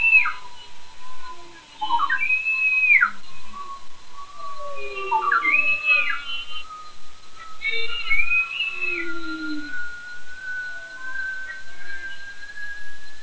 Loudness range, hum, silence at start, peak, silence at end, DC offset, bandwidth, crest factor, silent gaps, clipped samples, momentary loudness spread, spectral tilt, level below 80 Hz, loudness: 11 LU; none; 0 s; -4 dBFS; 0 s; under 0.1%; 8 kHz; 18 dB; none; under 0.1%; 23 LU; -2.5 dB/octave; -52 dBFS; -21 LUFS